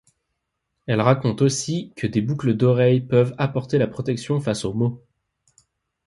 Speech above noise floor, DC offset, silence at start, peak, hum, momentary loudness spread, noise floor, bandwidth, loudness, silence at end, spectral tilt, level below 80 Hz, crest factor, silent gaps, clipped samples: 57 dB; under 0.1%; 0.9 s; -2 dBFS; none; 8 LU; -77 dBFS; 11.5 kHz; -21 LUFS; 1.1 s; -6.5 dB/octave; -56 dBFS; 20 dB; none; under 0.1%